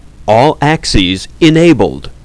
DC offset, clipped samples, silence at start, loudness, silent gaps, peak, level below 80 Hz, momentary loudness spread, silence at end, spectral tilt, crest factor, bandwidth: under 0.1%; 1%; 0.2 s; -10 LUFS; none; 0 dBFS; -26 dBFS; 5 LU; 0.1 s; -5.5 dB/octave; 10 dB; 11 kHz